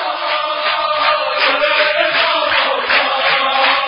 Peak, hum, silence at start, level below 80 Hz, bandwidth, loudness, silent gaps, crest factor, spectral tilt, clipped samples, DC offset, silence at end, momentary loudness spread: 0 dBFS; none; 0 s; -56 dBFS; 5.6 kHz; -13 LUFS; none; 14 dB; -6.5 dB/octave; under 0.1%; under 0.1%; 0 s; 4 LU